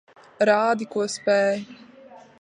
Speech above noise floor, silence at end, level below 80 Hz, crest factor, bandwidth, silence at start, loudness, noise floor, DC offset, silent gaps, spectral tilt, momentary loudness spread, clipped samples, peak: 26 dB; 0.2 s; -74 dBFS; 18 dB; 10.5 kHz; 0.4 s; -22 LUFS; -47 dBFS; under 0.1%; none; -4 dB/octave; 9 LU; under 0.1%; -6 dBFS